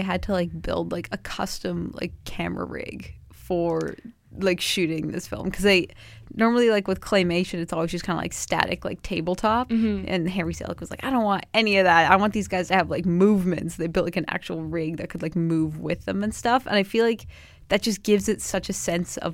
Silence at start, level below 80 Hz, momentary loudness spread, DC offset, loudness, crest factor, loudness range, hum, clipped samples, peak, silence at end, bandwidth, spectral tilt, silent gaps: 0 s; -46 dBFS; 12 LU; under 0.1%; -24 LUFS; 24 dB; 8 LU; none; under 0.1%; 0 dBFS; 0 s; 16.5 kHz; -5 dB/octave; none